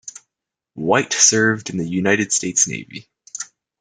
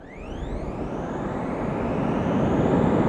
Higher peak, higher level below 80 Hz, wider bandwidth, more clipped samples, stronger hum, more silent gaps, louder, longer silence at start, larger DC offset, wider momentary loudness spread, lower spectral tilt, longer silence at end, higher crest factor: first, 0 dBFS vs -8 dBFS; second, -62 dBFS vs -38 dBFS; first, 11 kHz vs 9.6 kHz; neither; neither; neither; first, -17 LUFS vs -26 LUFS; about the same, 0.05 s vs 0 s; neither; first, 22 LU vs 12 LU; second, -2.5 dB/octave vs -8.5 dB/octave; first, 0.35 s vs 0 s; about the same, 20 dB vs 16 dB